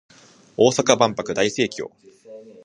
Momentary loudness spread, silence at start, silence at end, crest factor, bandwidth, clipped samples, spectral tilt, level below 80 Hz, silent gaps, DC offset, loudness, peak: 17 LU; 0.6 s; 0.2 s; 22 dB; 11 kHz; under 0.1%; -3.5 dB/octave; -62 dBFS; none; under 0.1%; -19 LUFS; 0 dBFS